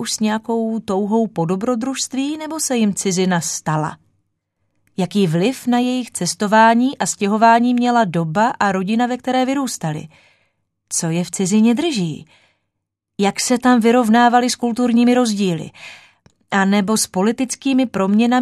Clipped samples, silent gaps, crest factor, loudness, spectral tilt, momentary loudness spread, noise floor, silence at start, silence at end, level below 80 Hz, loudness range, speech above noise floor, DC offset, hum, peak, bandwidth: under 0.1%; none; 18 dB; -17 LUFS; -4.5 dB/octave; 10 LU; -77 dBFS; 0 s; 0 s; -62 dBFS; 5 LU; 61 dB; under 0.1%; none; 0 dBFS; 13.5 kHz